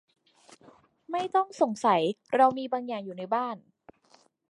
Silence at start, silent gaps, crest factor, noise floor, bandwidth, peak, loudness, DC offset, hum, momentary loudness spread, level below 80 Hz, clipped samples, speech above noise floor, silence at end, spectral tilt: 1.1 s; none; 20 dB; -63 dBFS; 11.5 kHz; -8 dBFS; -28 LUFS; under 0.1%; none; 12 LU; -80 dBFS; under 0.1%; 36 dB; 0.9 s; -5 dB/octave